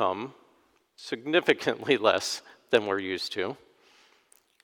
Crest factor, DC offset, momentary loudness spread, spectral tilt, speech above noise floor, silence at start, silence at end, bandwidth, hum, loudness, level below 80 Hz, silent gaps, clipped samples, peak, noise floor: 24 dB; under 0.1%; 14 LU; -3.5 dB/octave; 39 dB; 0 s; 1.1 s; 18.5 kHz; none; -27 LUFS; -76 dBFS; none; under 0.1%; -6 dBFS; -66 dBFS